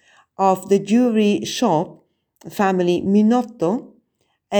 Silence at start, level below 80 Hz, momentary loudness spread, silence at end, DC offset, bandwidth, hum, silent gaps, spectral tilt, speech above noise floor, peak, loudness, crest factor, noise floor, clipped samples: 0.4 s; -64 dBFS; 7 LU; 0 s; under 0.1%; over 20 kHz; none; none; -6 dB/octave; 51 dB; -2 dBFS; -18 LUFS; 16 dB; -69 dBFS; under 0.1%